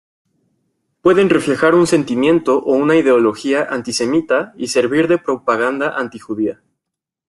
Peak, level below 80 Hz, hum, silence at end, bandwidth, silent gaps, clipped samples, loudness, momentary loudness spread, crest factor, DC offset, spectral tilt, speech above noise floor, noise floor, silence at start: -2 dBFS; -56 dBFS; none; 0.75 s; 12 kHz; none; under 0.1%; -15 LUFS; 9 LU; 14 dB; under 0.1%; -5 dB/octave; 67 dB; -82 dBFS; 1.05 s